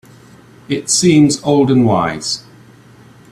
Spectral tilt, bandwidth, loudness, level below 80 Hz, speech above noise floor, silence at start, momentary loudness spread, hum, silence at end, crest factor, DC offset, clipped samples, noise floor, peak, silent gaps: -4.5 dB/octave; 13.5 kHz; -13 LUFS; -50 dBFS; 30 dB; 0.7 s; 12 LU; none; 0.9 s; 14 dB; under 0.1%; under 0.1%; -42 dBFS; 0 dBFS; none